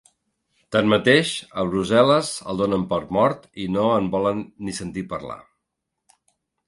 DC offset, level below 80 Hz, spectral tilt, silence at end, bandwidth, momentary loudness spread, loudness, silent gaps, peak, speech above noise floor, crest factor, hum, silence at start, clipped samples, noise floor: under 0.1%; -52 dBFS; -5 dB/octave; 1.3 s; 11.5 kHz; 14 LU; -21 LUFS; none; -2 dBFS; 59 dB; 20 dB; none; 0.7 s; under 0.1%; -80 dBFS